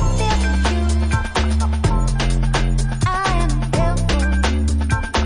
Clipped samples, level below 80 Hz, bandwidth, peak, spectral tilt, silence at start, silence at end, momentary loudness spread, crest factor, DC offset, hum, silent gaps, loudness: under 0.1%; -20 dBFS; 11 kHz; -4 dBFS; -5.5 dB/octave; 0 s; 0 s; 2 LU; 14 dB; under 0.1%; none; none; -19 LUFS